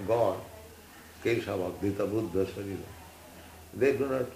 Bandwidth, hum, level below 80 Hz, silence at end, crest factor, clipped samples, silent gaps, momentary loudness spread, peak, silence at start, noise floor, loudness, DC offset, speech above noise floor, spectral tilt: 15.5 kHz; none; -62 dBFS; 0 s; 18 dB; under 0.1%; none; 21 LU; -14 dBFS; 0 s; -51 dBFS; -31 LUFS; under 0.1%; 21 dB; -6.5 dB/octave